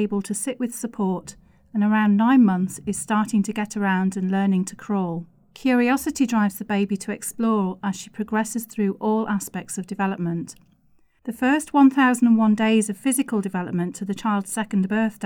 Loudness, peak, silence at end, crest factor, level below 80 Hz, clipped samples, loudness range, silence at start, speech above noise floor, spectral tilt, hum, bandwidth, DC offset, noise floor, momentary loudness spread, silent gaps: -22 LUFS; -6 dBFS; 0 s; 16 dB; -60 dBFS; under 0.1%; 5 LU; 0 s; 37 dB; -5.5 dB/octave; none; 18 kHz; under 0.1%; -59 dBFS; 12 LU; none